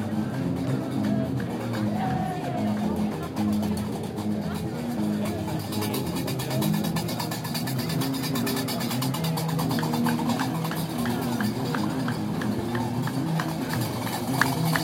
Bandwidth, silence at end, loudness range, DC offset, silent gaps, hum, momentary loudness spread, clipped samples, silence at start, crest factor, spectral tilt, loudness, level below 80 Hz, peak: 17 kHz; 0 s; 2 LU; under 0.1%; none; none; 4 LU; under 0.1%; 0 s; 22 dB; -5.5 dB/octave; -27 LUFS; -56 dBFS; -4 dBFS